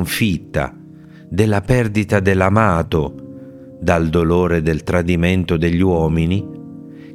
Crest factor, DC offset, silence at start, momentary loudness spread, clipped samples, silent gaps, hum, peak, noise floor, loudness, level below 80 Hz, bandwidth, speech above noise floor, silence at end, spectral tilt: 16 dB; under 0.1%; 0 s; 19 LU; under 0.1%; none; none; 0 dBFS; -39 dBFS; -17 LUFS; -36 dBFS; 16.5 kHz; 23 dB; 0 s; -7 dB/octave